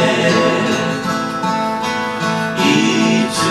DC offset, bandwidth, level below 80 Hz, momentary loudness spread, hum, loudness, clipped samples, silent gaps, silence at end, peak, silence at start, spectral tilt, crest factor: under 0.1%; 14 kHz; -52 dBFS; 6 LU; none; -16 LUFS; under 0.1%; none; 0 s; 0 dBFS; 0 s; -4.5 dB/octave; 14 dB